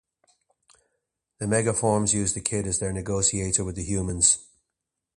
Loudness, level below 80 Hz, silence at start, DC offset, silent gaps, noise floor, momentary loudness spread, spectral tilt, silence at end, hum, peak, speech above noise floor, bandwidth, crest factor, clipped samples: -24 LUFS; -46 dBFS; 1.4 s; under 0.1%; none; -84 dBFS; 8 LU; -3.5 dB/octave; 0.75 s; none; -4 dBFS; 59 dB; 11.5 kHz; 22 dB; under 0.1%